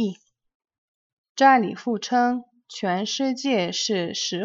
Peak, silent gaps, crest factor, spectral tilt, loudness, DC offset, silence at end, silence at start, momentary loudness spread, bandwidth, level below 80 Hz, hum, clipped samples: -4 dBFS; 0.55-0.60 s, 0.78-1.35 s; 20 dB; -3.5 dB/octave; -23 LUFS; under 0.1%; 0 s; 0 s; 13 LU; 7.8 kHz; -76 dBFS; none; under 0.1%